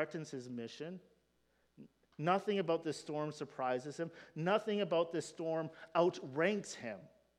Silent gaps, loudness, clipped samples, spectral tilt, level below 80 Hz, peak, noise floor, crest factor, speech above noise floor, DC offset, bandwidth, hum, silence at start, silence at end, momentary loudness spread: none; -38 LUFS; under 0.1%; -5.5 dB/octave; -84 dBFS; -18 dBFS; -76 dBFS; 20 dB; 39 dB; under 0.1%; 12 kHz; none; 0 s; 0.3 s; 12 LU